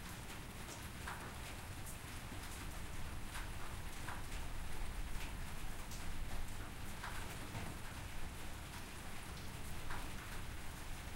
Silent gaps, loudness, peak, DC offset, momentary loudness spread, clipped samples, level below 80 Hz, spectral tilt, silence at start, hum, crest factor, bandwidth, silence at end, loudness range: none; -49 LUFS; -28 dBFS; under 0.1%; 2 LU; under 0.1%; -48 dBFS; -3.5 dB/octave; 0 s; none; 16 dB; 16 kHz; 0 s; 1 LU